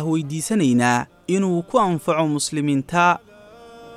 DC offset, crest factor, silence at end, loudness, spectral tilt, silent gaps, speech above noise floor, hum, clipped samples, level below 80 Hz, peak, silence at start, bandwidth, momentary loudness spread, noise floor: under 0.1%; 16 dB; 0 s; -20 LUFS; -5 dB/octave; none; 24 dB; none; under 0.1%; -58 dBFS; -4 dBFS; 0 s; 14.5 kHz; 6 LU; -44 dBFS